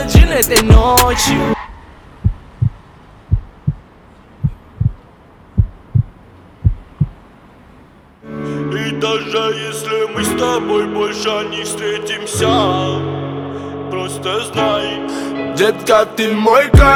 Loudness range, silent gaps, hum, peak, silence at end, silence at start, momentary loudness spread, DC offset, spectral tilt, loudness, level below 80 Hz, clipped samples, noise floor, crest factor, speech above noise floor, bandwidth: 8 LU; none; none; 0 dBFS; 0 s; 0 s; 12 LU; under 0.1%; -5 dB/octave; -16 LUFS; -22 dBFS; 0.1%; -43 dBFS; 16 dB; 31 dB; over 20 kHz